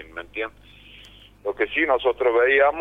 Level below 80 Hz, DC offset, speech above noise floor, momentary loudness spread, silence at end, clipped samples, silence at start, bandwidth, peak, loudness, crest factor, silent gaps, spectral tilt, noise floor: -52 dBFS; under 0.1%; 26 dB; 16 LU; 0 s; under 0.1%; 0 s; 4.9 kHz; -4 dBFS; -21 LUFS; 18 dB; none; -5.5 dB/octave; -48 dBFS